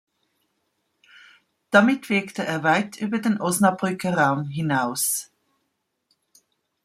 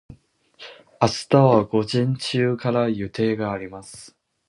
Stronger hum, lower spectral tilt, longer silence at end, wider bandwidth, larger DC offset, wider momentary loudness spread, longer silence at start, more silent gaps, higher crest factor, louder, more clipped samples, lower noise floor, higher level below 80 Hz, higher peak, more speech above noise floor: neither; second, -4.5 dB/octave vs -6.5 dB/octave; first, 1.6 s vs 0.4 s; first, 16 kHz vs 11.5 kHz; neither; second, 8 LU vs 25 LU; first, 1.7 s vs 0.1 s; neither; about the same, 22 dB vs 20 dB; about the same, -22 LUFS vs -21 LUFS; neither; first, -76 dBFS vs -52 dBFS; second, -68 dBFS vs -54 dBFS; about the same, -2 dBFS vs -2 dBFS; first, 54 dB vs 31 dB